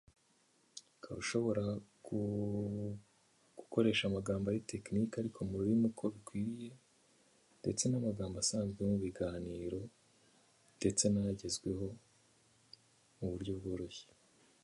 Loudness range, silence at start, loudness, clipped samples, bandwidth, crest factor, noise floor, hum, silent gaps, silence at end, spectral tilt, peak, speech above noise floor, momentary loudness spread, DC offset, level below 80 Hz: 4 LU; 0.75 s; -38 LUFS; under 0.1%; 11.5 kHz; 22 dB; -73 dBFS; none; none; 0.6 s; -5 dB/octave; -18 dBFS; 36 dB; 16 LU; under 0.1%; -62 dBFS